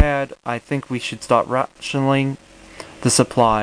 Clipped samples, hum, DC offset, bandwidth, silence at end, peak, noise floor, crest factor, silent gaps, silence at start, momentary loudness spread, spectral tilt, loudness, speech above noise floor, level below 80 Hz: under 0.1%; none; under 0.1%; 10.5 kHz; 0 s; 0 dBFS; -40 dBFS; 20 dB; none; 0 s; 11 LU; -4.5 dB/octave; -20 LUFS; 20 dB; -40 dBFS